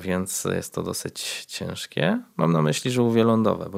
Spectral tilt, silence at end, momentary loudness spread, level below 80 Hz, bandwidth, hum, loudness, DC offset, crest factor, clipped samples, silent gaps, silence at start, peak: -5 dB/octave; 0 s; 10 LU; -64 dBFS; 16 kHz; none; -24 LUFS; under 0.1%; 18 dB; under 0.1%; none; 0 s; -4 dBFS